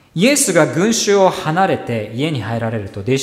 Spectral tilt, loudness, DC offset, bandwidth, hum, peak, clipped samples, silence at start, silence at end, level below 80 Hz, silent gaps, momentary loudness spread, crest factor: -4 dB/octave; -16 LUFS; under 0.1%; 16 kHz; none; 0 dBFS; under 0.1%; 0.15 s; 0 s; -54 dBFS; none; 9 LU; 16 dB